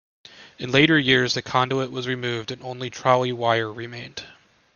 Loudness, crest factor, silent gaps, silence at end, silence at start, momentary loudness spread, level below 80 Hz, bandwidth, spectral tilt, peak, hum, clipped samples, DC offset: -21 LUFS; 22 dB; none; 0.45 s; 0.35 s; 18 LU; -60 dBFS; 7.2 kHz; -5 dB/octave; -2 dBFS; none; under 0.1%; under 0.1%